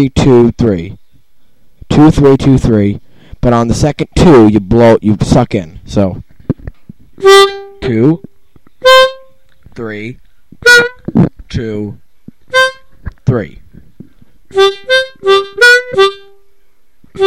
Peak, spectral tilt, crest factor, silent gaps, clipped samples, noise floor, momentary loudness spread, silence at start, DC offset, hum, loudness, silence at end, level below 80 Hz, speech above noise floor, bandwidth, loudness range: 0 dBFS; -5.5 dB/octave; 10 dB; none; 0.2%; -51 dBFS; 16 LU; 0 s; 1%; none; -9 LUFS; 0 s; -28 dBFS; 43 dB; 17 kHz; 5 LU